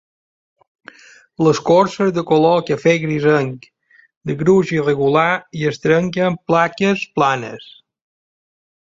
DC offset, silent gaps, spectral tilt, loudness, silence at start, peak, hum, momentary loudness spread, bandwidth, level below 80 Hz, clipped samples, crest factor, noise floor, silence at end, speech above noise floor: under 0.1%; 4.17-4.21 s; -6.5 dB/octave; -16 LUFS; 1.4 s; -2 dBFS; none; 10 LU; 7.8 kHz; -56 dBFS; under 0.1%; 16 dB; -43 dBFS; 1.1 s; 27 dB